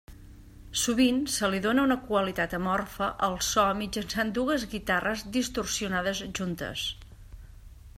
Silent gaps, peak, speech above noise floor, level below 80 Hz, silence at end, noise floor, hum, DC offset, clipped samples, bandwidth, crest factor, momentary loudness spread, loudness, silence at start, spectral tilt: none; -12 dBFS; 20 dB; -48 dBFS; 0.05 s; -48 dBFS; none; under 0.1%; under 0.1%; 16 kHz; 18 dB; 8 LU; -28 LUFS; 0.1 s; -3.5 dB/octave